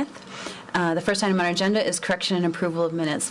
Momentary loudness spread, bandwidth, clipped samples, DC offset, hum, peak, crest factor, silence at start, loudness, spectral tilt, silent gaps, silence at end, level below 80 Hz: 11 LU; 12 kHz; under 0.1%; under 0.1%; none; -14 dBFS; 10 dB; 0 s; -24 LUFS; -4 dB/octave; none; 0 s; -62 dBFS